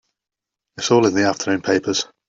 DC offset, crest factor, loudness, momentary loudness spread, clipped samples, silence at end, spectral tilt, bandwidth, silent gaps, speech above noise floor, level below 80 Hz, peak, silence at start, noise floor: under 0.1%; 18 dB; -18 LUFS; 7 LU; under 0.1%; 0.25 s; -4 dB/octave; 7.8 kHz; none; 68 dB; -62 dBFS; -4 dBFS; 0.8 s; -86 dBFS